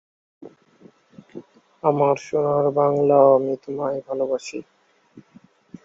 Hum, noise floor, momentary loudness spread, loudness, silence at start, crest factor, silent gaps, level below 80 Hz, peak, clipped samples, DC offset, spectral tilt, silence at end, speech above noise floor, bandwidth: none; -53 dBFS; 25 LU; -20 LUFS; 0.4 s; 20 dB; none; -68 dBFS; -4 dBFS; under 0.1%; under 0.1%; -7.5 dB/octave; 0.65 s; 34 dB; 7.8 kHz